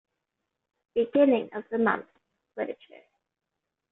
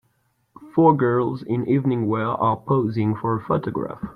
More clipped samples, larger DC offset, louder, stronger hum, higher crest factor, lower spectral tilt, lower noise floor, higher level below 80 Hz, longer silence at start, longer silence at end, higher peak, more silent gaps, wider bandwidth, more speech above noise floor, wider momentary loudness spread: neither; neither; second, -27 LUFS vs -21 LUFS; neither; about the same, 20 dB vs 18 dB; second, -4.5 dB/octave vs -10.5 dB/octave; first, -84 dBFS vs -67 dBFS; second, -72 dBFS vs -56 dBFS; first, 0.95 s vs 0.6 s; first, 1.15 s vs 0 s; second, -10 dBFS vs -4 dBFS; neither; second, 4 kHz vs 5.2 kHz; first, 58 dB vs 46 dB; first, 14 LU vs 8 LU